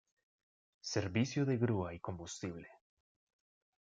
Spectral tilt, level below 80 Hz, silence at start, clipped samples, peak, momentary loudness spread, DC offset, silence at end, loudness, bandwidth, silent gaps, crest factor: -6 dB/octave; -72 dBFS; 0.85 s; under 0.1%; -20 dBFS; 12 LU; under 0.1%; 1.1 s; -38 LUFS; 9.2 kHz; none; 20 dB